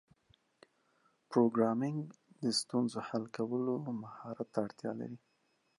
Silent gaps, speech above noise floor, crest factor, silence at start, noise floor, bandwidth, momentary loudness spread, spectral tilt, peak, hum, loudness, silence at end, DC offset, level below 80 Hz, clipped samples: none; 42 dB; 22 dB; 1.3 s; -77 dBFS; 11.5 kHz; 13 LU; -5.5 dB/octave; -16 dBFS; none; -36 LUFS; 0.6 s; under 0.1%; -82 dBFS; under 0.1%